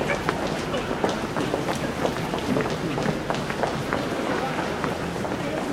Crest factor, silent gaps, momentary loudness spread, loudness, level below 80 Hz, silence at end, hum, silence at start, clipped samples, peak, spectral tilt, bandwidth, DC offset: 22 dB; none; 2 LU; -26 LUFS; -46 dBFS; 0 s; none; 0 s; under 0.1%; -4 dBFS; -5 dB/octave; 16 kHz; under 0.1%